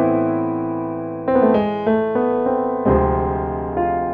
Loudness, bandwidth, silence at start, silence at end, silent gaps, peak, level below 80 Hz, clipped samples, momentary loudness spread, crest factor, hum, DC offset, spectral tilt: -19 LUFS; 4.6 kHz; 0 s; 0 s; none; -4 dBFS; -34 dBFS; under 0.1%; 7 LU; 14 dB; none; under 0.1%; -11 dB/octave